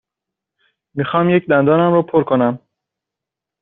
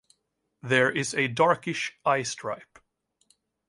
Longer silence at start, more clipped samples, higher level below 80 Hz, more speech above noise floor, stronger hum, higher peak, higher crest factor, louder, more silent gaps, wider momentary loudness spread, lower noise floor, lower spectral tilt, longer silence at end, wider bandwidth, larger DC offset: first, 0.95 s vs 0.65 s; neither; first, -58 dBFS vs -72 dBFS; first, 70 dB vs 51 dB; neither; first, -2 dBFS vs -6 dBFS; second, 14 dB vs 22 dB; first, -15 LUFS vs -26 LUFS; neither; about the same, 12 LU vs 13 LU; first, -84 dBFS vs -77 dBFS; first, -6.5 dB/octave vs -4 dB/octave; about the same, 1.05 s vs 1.05 s; second, 4 kHz vs 11.5 kHz; neither